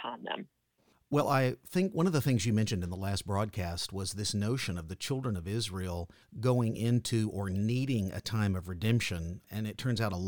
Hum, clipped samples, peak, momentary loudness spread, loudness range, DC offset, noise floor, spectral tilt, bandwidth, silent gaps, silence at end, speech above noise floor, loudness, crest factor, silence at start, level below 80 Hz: none; under 0.1%; -16 dBFS; 9 LU; 3 LU; 0.1%; -71 dBFS; -5.5 dB/octave; 19 kHz; none; 0 s; 39 dB; -32 LUFS; 16 dB; 0 s; -56 dBFS